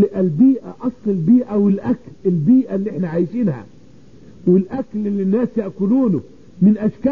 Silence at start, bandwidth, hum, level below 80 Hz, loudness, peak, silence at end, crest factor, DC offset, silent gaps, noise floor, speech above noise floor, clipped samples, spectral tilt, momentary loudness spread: 0 s; 4.1 kHz; none; -54 dBFS; -18 LUFS; -4 dBFS; 0 s; 14 dB; 0.6%; none; -45 dBFS; 29 dB; under 0.1%; -11.5 dB/octave; 9 LU